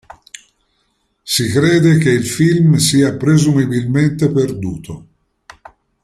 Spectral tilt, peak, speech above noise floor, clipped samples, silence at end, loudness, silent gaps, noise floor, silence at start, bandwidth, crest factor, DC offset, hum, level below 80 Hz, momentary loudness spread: -5.5 dB/octave; -2 dBFS; 51 dB; under 0.1%; 1.05 s; -13 LUFS; none; -64 dBFS; 1.25 s; 15.5 kHz; 14 dB; under 0.1%; none; -46 dBFS; 14 LU